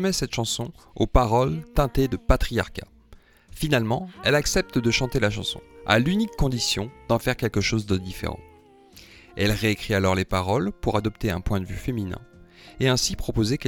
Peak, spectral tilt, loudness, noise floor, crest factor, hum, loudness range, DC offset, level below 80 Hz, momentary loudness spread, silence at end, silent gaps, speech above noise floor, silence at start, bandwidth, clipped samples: -2 dBFS; -5 dB/octave; -24 LUFS; -52 dBFS; 22 dB; none; 3 LU; under 0.1%; -34 dBFS; 9 LU; 0 s; none; 28 dB; 0 s; 18.5 kHz; under 0.1%